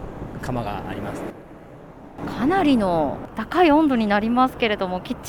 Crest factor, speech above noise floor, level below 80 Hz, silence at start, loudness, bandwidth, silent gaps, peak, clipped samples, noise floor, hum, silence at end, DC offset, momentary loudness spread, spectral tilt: 16 dB; 21 dB; -44 dBFS; 0 s; -21 LUFS; 17 kHz; none; -6 dBFS; under 0.1%; -42 dBFS; none; 0 s; under 0.1%; 17 LU; -6.5 dB/octave